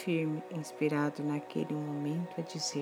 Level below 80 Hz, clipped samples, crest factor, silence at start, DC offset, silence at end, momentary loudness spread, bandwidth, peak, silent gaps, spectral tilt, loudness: -86 dBFS; under 0.1%; 16 dB; 0 s; under 0.1%; 0 s; 6 LU; 14 kHz; -20 dBFS; none; -5.5 dB/octave; -35 LUFS